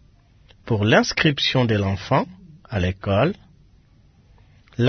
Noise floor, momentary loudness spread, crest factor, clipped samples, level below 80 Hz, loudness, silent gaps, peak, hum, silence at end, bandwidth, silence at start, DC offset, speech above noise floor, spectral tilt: -54 dBFS; 13 LU; 20 dB; under 0.1%; -50 dBFS; -20 LUFS; none; -2 dBFS; none; 0 s; 6.6 kHz; 0.65 s; under 0.1%; 34 dB; -5.5 dB/octave